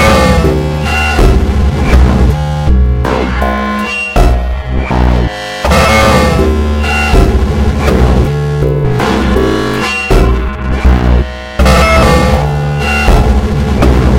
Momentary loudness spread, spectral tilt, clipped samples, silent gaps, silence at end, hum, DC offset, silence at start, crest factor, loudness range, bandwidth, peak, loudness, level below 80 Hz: 6 LU; -6 dB/octave; 1%; none; 0 s; none; under 0.1%; 0 s; 8 dB; 2 LU; 16 kHz; 0 dBFS; -10 LUFS; -12 dBFS